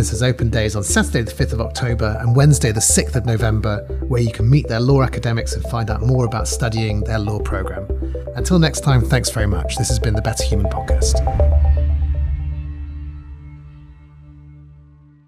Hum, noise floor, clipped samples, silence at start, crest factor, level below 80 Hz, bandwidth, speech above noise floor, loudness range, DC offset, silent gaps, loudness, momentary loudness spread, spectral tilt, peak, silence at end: none; -46 dBFS; under 0.1%; 0 s; 14 dB; -22 dBFS; 15.5 kHz; 29 dB; 4 LU; under 0.1%; none; -18 LUFS; 11 LU; -5 dB/octave; -4 dBFS; 0.5 s